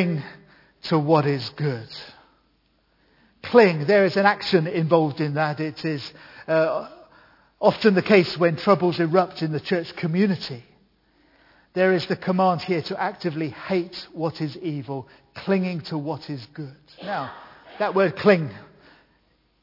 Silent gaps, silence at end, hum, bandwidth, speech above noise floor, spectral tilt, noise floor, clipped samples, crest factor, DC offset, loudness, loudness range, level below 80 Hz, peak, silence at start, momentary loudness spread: none; 1 s; none; 5.8 kHz; 43 dB; -7.5 dB/octave; -65 dBFS; under 0.1%; 22 dB; under 0.1%; -22 LUFS; 7 LU; -66 dBFS; -2 dBFS; 0 s; 18 LU